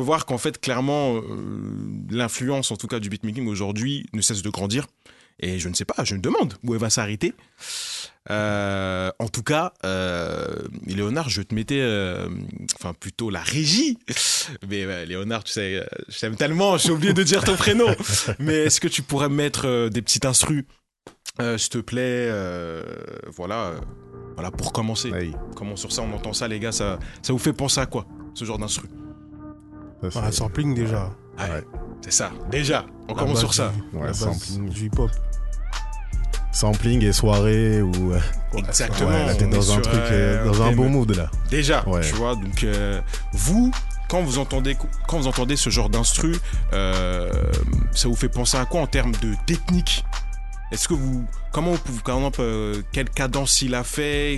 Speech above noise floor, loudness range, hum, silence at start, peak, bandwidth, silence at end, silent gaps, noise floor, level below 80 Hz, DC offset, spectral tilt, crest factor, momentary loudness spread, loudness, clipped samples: 26 dB; 7 LU; none; 0 s; -2 dBFS; 12.5 kHz; 0 s; none; -49 dBFS; -28 dBFS; under 0.1%; -4 dB/octave; 22 dB; 13 LU; -23 LUFS; under 0.1%